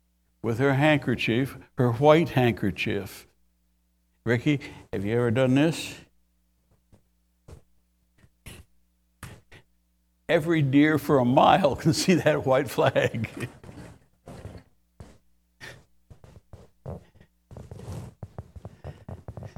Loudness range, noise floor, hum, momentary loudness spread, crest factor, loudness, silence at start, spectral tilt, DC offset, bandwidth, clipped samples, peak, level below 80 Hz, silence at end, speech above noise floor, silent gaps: 22 LU; -69 dBFS; none; 25 LU; 24 dB; -23 LUFS; 0.45 s; -6 dB/octave; under 0.1%; 17.5 kHz; under 0.1%; -4 dBFS; -54 dBFS; 0.1 s; 46 dB; none